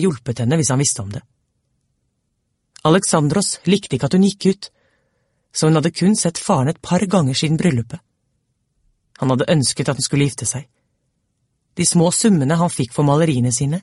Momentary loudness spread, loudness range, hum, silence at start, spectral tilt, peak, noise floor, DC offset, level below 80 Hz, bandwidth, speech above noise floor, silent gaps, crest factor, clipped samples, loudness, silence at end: 9 LU; 3 LU; none; 0 s; -5 dB/octave; -2 dBFS; -70 dBFS; under 0.1%; -52 dBFS; 11.5 kHz; 54 dB; none; 16 dB; under 0.1%; -17 LUFS; 0 s